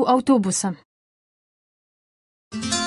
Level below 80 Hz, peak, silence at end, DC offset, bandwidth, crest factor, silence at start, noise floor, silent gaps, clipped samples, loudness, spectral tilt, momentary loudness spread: -56 dBFS; -6 dBFS; 0 s; under 0.1%; 11.5 kHz; 18 dB; 0 s; under -90 dBFS; 0.85-2.51 s; under 0.1%; -21 LUFS; -4 dB/octave; 18 LU